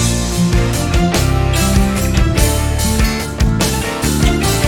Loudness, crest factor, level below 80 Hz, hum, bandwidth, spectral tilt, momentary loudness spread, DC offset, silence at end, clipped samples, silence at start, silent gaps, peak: -15 LUFS; 12 dB; -18 dBFS; none; 19 kHz; -4.5 dB/octave; 3 LU; under 0.1%; 0 s; under 0.1%; 0 s; none; 0 dBFS